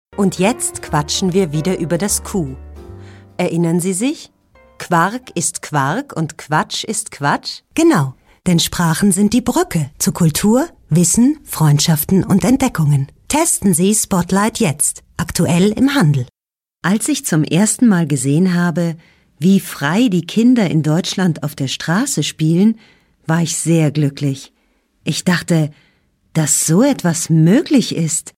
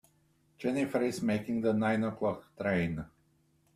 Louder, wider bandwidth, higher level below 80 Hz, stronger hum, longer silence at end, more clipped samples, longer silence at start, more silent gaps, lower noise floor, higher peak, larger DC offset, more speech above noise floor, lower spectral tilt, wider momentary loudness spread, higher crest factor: first, -15 LUFS vs -32 LUFS; about the same, 16 kHz vs 15 kHz; first, -44 dBFS vs -62 dBFS; neither; second, 0.1 s vs 0.7 s; neither; second, 0.15 s vs 0.6 s; neither; first, under -90 dBFS vs -70 dBFS; first, 0 dBFS vs -16 dBFS; neither; first, over 75 dB vs 39 dB; second, -5 dB/octave vs -7 dB/octave; about the same, 9 LU vs 7 LU; about the same, 14 dB vs 16 dB